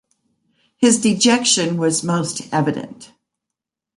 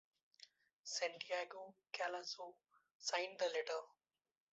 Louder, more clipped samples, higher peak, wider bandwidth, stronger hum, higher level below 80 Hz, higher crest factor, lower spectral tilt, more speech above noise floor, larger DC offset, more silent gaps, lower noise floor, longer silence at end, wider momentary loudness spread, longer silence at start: first, -17 LUFS vs -44 LUFS; neither; first, -2 dBFS vs -24 dBFS; first, 11.5 kHz vs 8 kHz; neither; first, -62 dBFS vs under -90 dBFS; second, 16 dB vs 22 dB; first, -3.5 dB/octave vs 1.5 dB/octave; first, 67 dB vs 23 dB; neither; second, none vs 0.73-0.84 s, 2.91-3.00 s; first, -84 dBFS vs -68 dBFS; first, 0.9 s vs 0.65 s; second, 8 LU vs 22 LU; first, 0.8 s vs 0.4 s